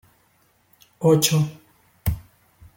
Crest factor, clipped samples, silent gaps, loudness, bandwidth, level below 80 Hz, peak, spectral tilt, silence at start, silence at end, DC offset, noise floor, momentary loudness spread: 22 dB; under 0.1%; none; -21 LUFS; 17 kHz; -42 dBFS; -2 dBFS; -5 dB/octave; 1 s; 0.6 s; under 0.1%; -62 dBFS; 12 LU